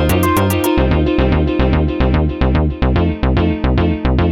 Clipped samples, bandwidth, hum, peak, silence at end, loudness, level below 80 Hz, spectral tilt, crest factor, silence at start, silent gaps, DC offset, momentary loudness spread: under 0.1%; 17 kHz; none; -2 dBFS; 0 s; -15 LUFS; -20 dBFS; -7 dB/octave; 12 dB; 0 s; none; under 0.1%; 2 LU